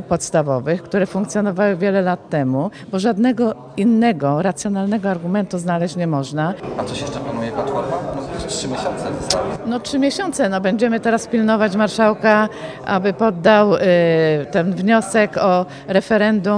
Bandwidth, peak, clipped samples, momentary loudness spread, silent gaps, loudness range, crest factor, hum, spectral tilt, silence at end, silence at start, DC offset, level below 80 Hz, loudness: 10.5 kHz; 0 dBFS; under 0.1%; 9 LU; none; 7 LU; 18 dB; none; -5.5 dB/octave; 0 s; 0 s; under 0.1%; -48 dBFS; -18 LUFS